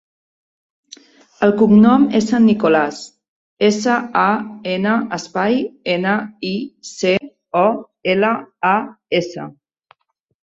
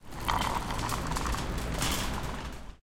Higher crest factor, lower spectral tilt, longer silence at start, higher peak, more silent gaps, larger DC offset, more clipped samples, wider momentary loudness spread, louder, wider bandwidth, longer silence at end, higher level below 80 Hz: second, 16 dB vs 24 dB; first, -5.5 dB/octave vs -3.5 dB/octave; first, 1.4 s vs 0 s; first, -2 dBFS vs -10 dBFS; first, 3.28-3.57 s vs none; neither; neither; first, 12 LU vs 7 LU; first, -17 LUFS vs -32 LUFS; second, 7.8 kHz vs 17 kHz; first, 0.9 s vs 0.05 s; second, -58 dBFS vs -38 dBFS